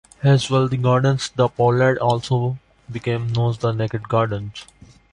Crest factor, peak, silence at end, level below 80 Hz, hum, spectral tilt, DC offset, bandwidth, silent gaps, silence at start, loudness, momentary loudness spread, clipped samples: 16 dB; -4 dBFS; 0.5 s; -50 dBFS; none; -6.5 dB/octave; under 0.1%; 10.5 kHz; none; 0.2 s; -20 LUFS; 12 LU; under 0.1%